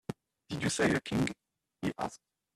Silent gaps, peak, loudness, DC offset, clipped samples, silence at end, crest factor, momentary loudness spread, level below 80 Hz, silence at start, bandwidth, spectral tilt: none; -14 dBFS; -33 LUFS; under 0.1%; under 0.1%; 0.4 s; 22 dB; 16 LU; -60 dBFS; 0.1 s; 14 kHz; -4.5 dB/octave